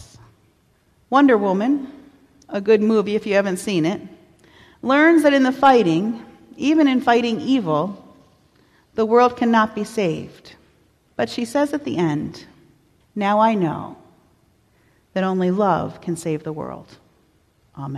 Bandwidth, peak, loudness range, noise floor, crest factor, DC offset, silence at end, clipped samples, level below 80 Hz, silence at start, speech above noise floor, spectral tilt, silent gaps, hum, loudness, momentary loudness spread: 14 kHz; -4 dBFS; 8 LU; -60 dBFS; 16 dB; under 0.1%; 0 s; under 0.1%; -58 dBFS; 1.1 s; 42 dB; -6 dB/octave; none; none; -19 LUFS; 17 LU